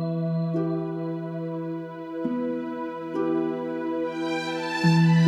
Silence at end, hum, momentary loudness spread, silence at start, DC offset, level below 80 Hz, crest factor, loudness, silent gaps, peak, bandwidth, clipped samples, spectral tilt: 0 s; none; 9 LU; 0 s; under 0.1%; -66 dBFS; 16 dB; -27 LUFS; none; -8 dBFS; 9.2 kHz; under 0.1%; -7.5 dB/octave